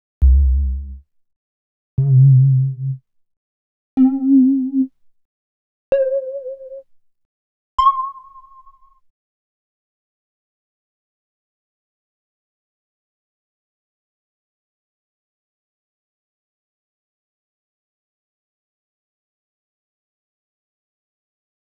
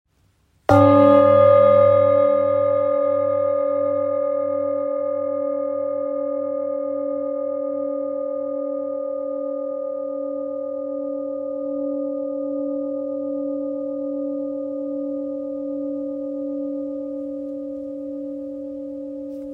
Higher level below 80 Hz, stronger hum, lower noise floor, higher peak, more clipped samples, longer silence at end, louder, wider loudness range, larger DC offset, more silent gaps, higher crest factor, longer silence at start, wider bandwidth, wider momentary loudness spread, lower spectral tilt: first, -28 dBFS vs -60 dBFS; neither; second, -49 dBFS vs -62 dBFS; about the same, -4 dBFS vs -2 dBFS; neither; first, 13.45 s vs 0 s; first, -16 LUFS vs -21 LUFS; second, 9 LU vs 12 LU; neither; first, 1.36-1.97 s, 3.37-3.97 s, 5.25-5.92 s, 7.25-7.78 s vs none; about the same, 18 dB vs 18 dB; second, 0.2 s vs 0.7 s; first, 5.4 kHz vs 4.4 kHz; about the same, 18 LU vs 16 LU; first, -11.5 dB/octave vs -9 dB/octave